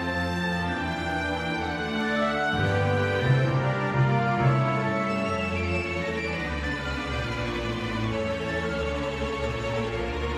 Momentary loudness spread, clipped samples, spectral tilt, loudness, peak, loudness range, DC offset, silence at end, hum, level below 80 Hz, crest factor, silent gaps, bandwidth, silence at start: 6 LU; under 0.1%; -6.5 dB/octave; -27 LUFS; -10 dBFS; 5 LU; under 0.1%; 0 s; none; -40 dBFS; 16 dB; none; 11.5 kHz; 0 s